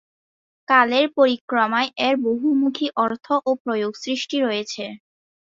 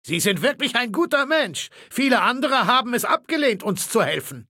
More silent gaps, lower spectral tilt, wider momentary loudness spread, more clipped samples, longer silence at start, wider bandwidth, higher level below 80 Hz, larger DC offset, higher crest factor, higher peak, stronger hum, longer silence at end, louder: first, 1.41-1.48 s, 3.60-3.65 s vs none; about the same, -3.5 dB/octave vs -3 dB/octave; first, 9 LU vs 5 LU; neither; first, 0.7 s vs 0.05 s; second, 7.8 kHz vs 17 kHz; about the same, -70 dBFS vs -72 dBFS; neither; about the same, 18 dB vs 18 dB; about the same, -4 dBFS vs -4 dBFS; neither; first, 0.65 s vs 0.05 s; about the same, -20 LUFS vs -20 LUFS